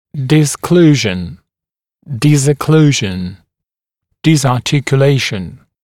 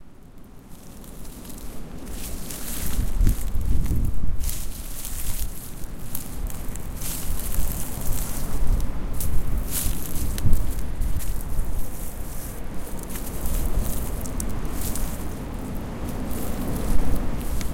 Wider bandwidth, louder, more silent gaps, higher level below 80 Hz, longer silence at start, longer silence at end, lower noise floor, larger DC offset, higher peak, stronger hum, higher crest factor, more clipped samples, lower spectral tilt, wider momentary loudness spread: second, 14.5 kHz vs 17 kHz; first, -12 LUFS vs -30 LUFS; neither; second, -46 dBFS vs -26 dBFS; first, 0.15 s vs 0 s; first, 0.3 s vs 0 s; first, -88 dBFS vs -42 dBFS; neither; about the same, 0 dBFS vs -2 dBFS; neither; about the same, 14 dB vs 18 dB; neither; about the same, -5.5 dB/octave vs -5 dB/octave; about the same, 14 LU vs 12 LU